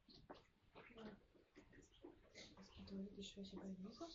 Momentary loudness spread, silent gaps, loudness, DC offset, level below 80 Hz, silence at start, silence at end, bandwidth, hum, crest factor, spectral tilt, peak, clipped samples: 14 LU; none; -58 LUFS; under 0.1%; -76 dBFS; 0 s; 0 s; 7.6 kHz; none; 16 dB; -5 dB/octave; -42 dBFS; under 0.1%